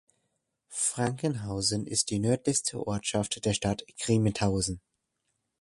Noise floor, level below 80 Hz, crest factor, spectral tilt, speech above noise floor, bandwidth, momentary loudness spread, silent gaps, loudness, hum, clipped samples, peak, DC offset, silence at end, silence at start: -80 dBFS; -52 dBFS; 18 dB; -4 dB/octave; 51 dB; 11.5 kHz; 6 LU; none; -29 LUFS; none; under 0.1%; -12 dBFS; under 0.1%; 0.85 s; 0.7 s